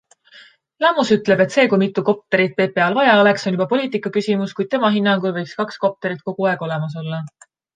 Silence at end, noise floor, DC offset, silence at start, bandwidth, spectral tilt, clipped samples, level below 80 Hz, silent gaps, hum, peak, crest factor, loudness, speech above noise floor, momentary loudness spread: 0.5 s; -47 dBFS; under 0.1%; 0.35 s; 9.2 kHz; -6 dB/octave; under 0.1%; -66 dBFS; none; none; -2 dBFS; 16 dB; -18 LUFS; 30 dB; 11 LU